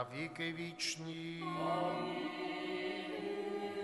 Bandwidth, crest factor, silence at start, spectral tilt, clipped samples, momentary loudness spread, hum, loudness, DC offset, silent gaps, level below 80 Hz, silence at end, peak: 11.5 kHz; 16 dB; 0 s; -4 dB/octave; under 0.1%; 5 LU; none; -40 LUFS; under 0.1%; none; -80 dBFS; 0 s; -24 dBFS